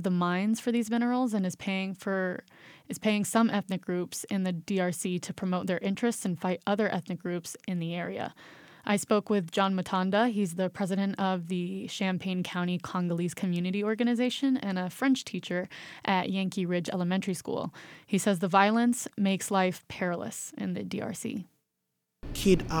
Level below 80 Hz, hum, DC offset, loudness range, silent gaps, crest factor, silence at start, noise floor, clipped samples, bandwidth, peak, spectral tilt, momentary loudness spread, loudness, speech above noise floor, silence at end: -56 dBFS; none; under 0.1%; 3 LU; none; 22 dB; 0 s; -82 dBFS; under 0.1%; 19 kHz; -8 dBFS; -5.5 dB/octave; 9 LU; -30 LUFS; 53 dB; 0 s